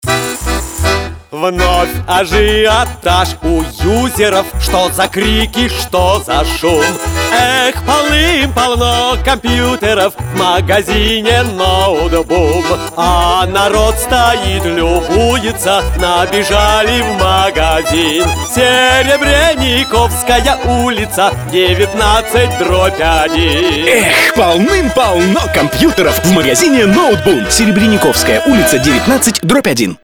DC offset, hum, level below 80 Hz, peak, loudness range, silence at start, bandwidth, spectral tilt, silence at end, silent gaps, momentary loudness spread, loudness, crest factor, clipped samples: under 0.1%; none; -22 dBFS; 0 dBFS; 3 LU; 0.05 s; 18.5 kHz; -4 dB/octave; 0.1 s; none; 5 LU; -10 LUFS; 10 dB; under 0.1%